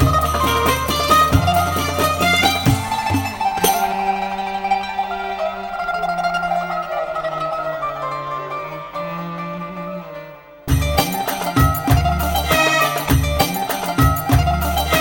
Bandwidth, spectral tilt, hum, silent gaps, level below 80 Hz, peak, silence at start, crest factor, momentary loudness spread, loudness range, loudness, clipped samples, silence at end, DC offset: over 20 kHz; -4.5 dB/octave; none; none; -28 dBFS; -2 dBFS; 0 s; 18 dB; 12 LU; 8 LU; -18 LUFS; under 0.1%; 0 s; under 0.1%